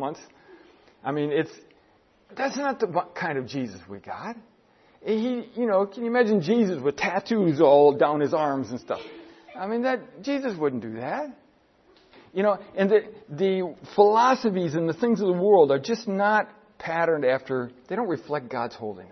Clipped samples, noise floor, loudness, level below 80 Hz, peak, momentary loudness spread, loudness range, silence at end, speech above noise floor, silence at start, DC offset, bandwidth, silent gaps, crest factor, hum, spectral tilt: under 0.1%; -61 dBFS; -24 LUFS; -70 dBFS; -4 dBFS; 17 LU; 9 LU; 0.05 s; 37 dB; 0 s; under 0.1%; 6.4 kHz; none; 20 dB; none; -6.5 dB/octave